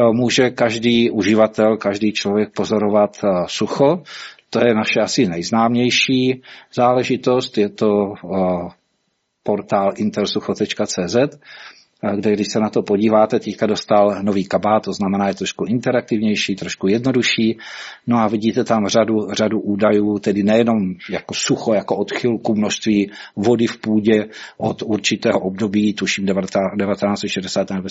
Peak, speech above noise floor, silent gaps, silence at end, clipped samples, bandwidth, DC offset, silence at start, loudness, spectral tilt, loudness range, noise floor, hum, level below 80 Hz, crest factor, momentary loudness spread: -2 dBFS; 52 dB; none; 0 s; under 0.1%; 8 kHz; under 0.1%; 0 s; -18 LUFS; -4.5 dB/octave; 3 LU; -69 dBFS; none; -58 dBFS; 16 dB; 8 LU